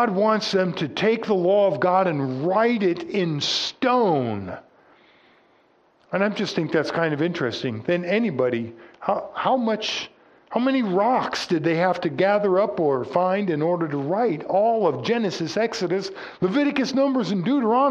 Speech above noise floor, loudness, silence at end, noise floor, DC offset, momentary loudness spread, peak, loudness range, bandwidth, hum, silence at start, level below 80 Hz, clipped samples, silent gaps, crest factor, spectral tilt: 38 dB; -22 LUFS; 0 s; -60 dBFS; under 0.1%; 7 LU; -6 dBFS; 4 LU; 9.6 kHz; none; 0 s; -68 dBFS; under 0.1%; none; 16 dB; -5.5 dB/octave